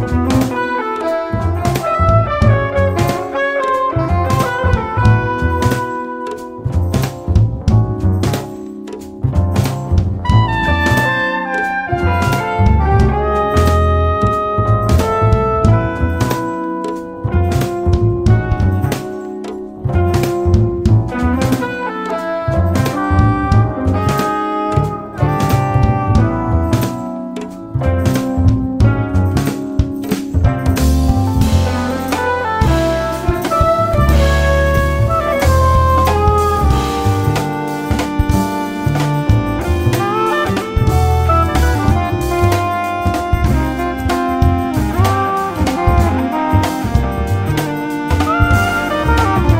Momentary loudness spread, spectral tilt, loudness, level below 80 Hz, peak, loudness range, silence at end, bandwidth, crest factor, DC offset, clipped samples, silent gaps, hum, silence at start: 6 LU; -7 dB/octave; -15 LUFS; -22 dBFS; 0 dBFS; 3 LU; 0 s; 16.5 kHz; 14 dB; 0.9%; under 0.1%; none; none; 0 s